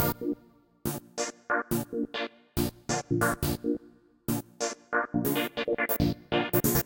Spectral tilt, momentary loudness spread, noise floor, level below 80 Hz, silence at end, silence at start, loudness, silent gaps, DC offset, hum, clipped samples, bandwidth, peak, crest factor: -4.5 dB/octave; 9 LU; -59 dBFS; -48 dBFS; 0 s; 0 s; -30 LUFS; none; under 0.1%; none; under 0.1%; 17 kHz; -10 dBFS; 20 dB